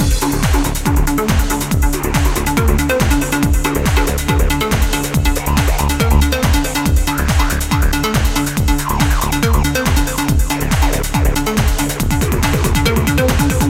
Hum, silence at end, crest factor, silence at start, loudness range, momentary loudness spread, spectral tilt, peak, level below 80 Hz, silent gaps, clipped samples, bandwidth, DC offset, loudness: none; 0 s; 14 dB; 0 s; 1 LU; 2 LU; -5 dB/octave; 0 dBFS; -18 dBFS; none; under 0.1%; 17 kHz; under 0.1%; -15 LUFS